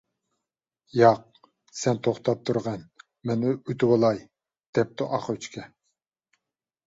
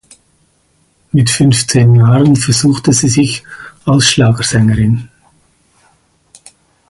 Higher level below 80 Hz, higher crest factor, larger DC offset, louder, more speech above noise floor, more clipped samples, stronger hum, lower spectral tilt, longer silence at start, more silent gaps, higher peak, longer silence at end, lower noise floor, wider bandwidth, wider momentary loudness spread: second, -64 dBFS vs -38 dBFS; first, 22 dB vs 12 dB; neither; second, -25 LUFS vs -10 LUFS; first, 63 dB vs 46 dB; neither; neither; first, -6.5 dB/octave vs -5 dB/octave; second, 0.95 s vs 1.15 s; first, 4.67-4.73 s vs none; second, -4 dBFS vs 0 dBFS; second, 1.2 s vs 1.85 s; first, -87 dBFS vs -55 dBFS; second, 8 kHz vs 11.5 kHz; first, 16 LU vs 9 LU